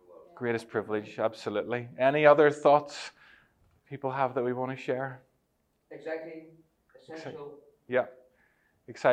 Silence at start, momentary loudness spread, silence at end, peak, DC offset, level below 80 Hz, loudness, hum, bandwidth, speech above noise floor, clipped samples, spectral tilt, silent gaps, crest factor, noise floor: 0.35 s; 23 LU; 0 s; -6 dBFS; under 0.1%; -78 dBFS; -28 LUFS; none; 10 kHz; 46 dB; under 0.1%; -6 dB/octave; none; 24 dB; -74 dBFS